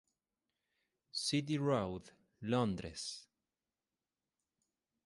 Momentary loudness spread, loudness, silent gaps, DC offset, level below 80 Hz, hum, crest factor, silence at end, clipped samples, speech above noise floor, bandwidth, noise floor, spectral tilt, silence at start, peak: 12 LU; -38 LUFS; none; under 0.1%; -66 dBFS; none; 20 dB; 1.85 s; under 0.1%; over 53 dB; 11.5 kHz; under -90 dBFS; -5 dB/octave; 1.15 s; -20 dBFS